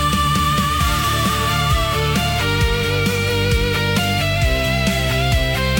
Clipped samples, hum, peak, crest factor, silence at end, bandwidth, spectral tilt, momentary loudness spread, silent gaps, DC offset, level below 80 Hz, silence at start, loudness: under 0.1%; none; -4 dBFS; 12 dB; 0 s; 17 kHz; -4.5 dB/octave; 1 LU; none; under 0.1%; -26 dBFS; 0 s; -17 LUFS